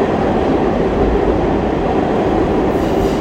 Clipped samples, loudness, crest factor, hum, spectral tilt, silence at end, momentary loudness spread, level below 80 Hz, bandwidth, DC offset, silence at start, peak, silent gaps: under 0.1%; -15 LUFS; 12 dB; none; -7.5 dB/octave; 0 s; 1 LU; -26 dBFS; 16 kHz; under 0.1%; 0 s; -2 dBFS; none